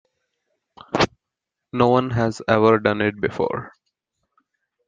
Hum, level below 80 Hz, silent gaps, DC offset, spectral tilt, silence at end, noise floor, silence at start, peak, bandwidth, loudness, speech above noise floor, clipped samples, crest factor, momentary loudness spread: none; -52 dBFS; none; under 0.1%; -6.5 dB/octave; 1.2 s; -84 dBFS; 0.95 s; -2 dBFS; 9.2 kHz; -20 LUFS; 65 dB; under 0.1%; 20 dB; 10 LU